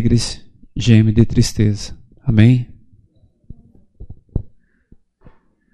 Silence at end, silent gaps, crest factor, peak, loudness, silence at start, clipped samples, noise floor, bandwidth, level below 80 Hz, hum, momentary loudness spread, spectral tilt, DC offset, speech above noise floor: 1.25 s; none; 18 dB; 0 dBFS; -15 LUFS; 0 s; under 0.1%; -54 dBFS; 12 kHz; -32 dBFS; none; 20 LU; -6.5 dB/octave; under 0.1%; 41 dB